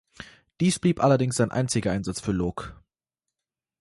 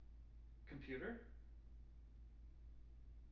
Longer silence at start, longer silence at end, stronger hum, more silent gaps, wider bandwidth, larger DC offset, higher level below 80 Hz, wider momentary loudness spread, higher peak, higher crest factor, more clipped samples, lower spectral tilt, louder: first, 0.2 s vs 0 s; first, 1.05 s vs 0 s; neither; neither; first, 11.5 kHz vs 6 kHz; neither; first, -50 dBFS vs -60 dBFS; first, 22 LU vs 14 LU; first, -8 dBFS vs -36 dBFS; about the same, 18 dB vs 20 dB; neither; about the same, -5.5 dB/octave vs -6 dB/octave; first, -25 LUFS vs -57 LUFS